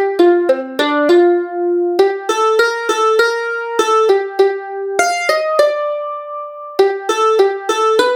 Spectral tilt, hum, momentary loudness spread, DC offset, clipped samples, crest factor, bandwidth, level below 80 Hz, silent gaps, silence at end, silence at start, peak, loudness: -2 dB/octave; none; 8 LU; under 0.1%; under 0.1%; 14 dB; 17 kHz; -68 dBFS; none; 0 s; 0 s; 0 dBFS; -14 LUFS